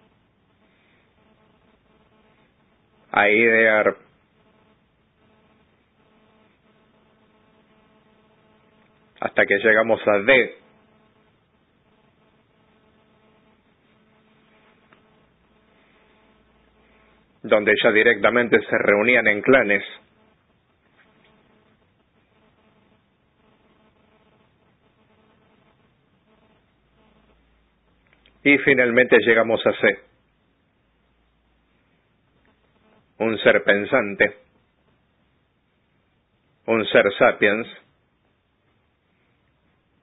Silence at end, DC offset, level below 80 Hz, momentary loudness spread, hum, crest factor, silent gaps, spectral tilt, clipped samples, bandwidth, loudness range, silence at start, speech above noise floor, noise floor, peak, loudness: 2.3 s; under 0.1%; -62 dBFS; 10 LU; none; 22 dB; none; -9 dB/octave; under 0.1%; 4 kHz; 8 LU; 3.15 s; 49 dB; -66 dBFS; -2 dBFS; -18 LUFS